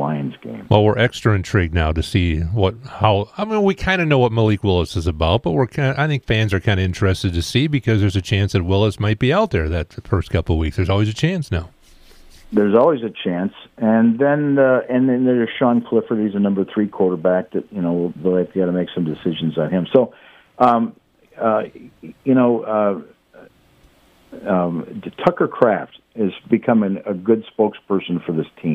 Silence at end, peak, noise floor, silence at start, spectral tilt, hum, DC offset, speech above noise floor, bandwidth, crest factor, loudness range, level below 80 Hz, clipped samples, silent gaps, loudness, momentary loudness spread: 0 s; 0 dBFS; -53 dBFS; 0 s; -7 dB/octave; none; under 0.1%; 35 dB; 13.5 kHz; 18 dB; 4 LU; -40 dBFS; under 0.1%; none; -18 LUFS; 8 LU